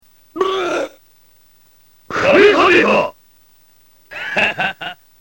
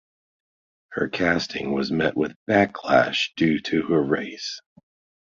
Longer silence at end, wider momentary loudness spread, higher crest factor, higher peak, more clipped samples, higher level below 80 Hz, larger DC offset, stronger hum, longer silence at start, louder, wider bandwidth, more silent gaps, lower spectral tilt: second, 0.3 s vs 0.6 s; first, 19 LU vs 11 LU; about the same, 18 dB vs 20 dB; first, 0 dBFS vs -4 dBFS; neither; about the same, -52 dBFS vs -54 dBFS; first, 0.2% vs under 0.1%; neither; second, 0.35 s vs 0.9 s; first, -14 LUFS vs -23 LUFS; first, 16.5 kHz vs 7.4 kHz; second, none vs 2.36-2.46 s; about the same, -4.5 dB/octave vs -5.5 dB/octave